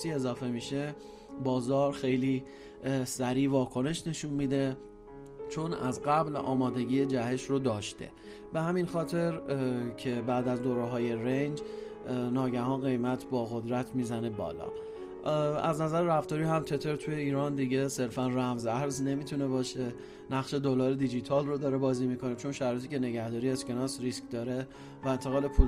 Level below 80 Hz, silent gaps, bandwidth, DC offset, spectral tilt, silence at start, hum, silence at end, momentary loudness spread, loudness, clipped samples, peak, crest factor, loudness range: -44 dBFS; none; 15.5 kHz; under 0.1%; -6.5 dB/octave; 0 s; none; 0 s; 9 LU; -32 LUFS; under 0.1%; -8 dBFS; 22 dB; 2 LU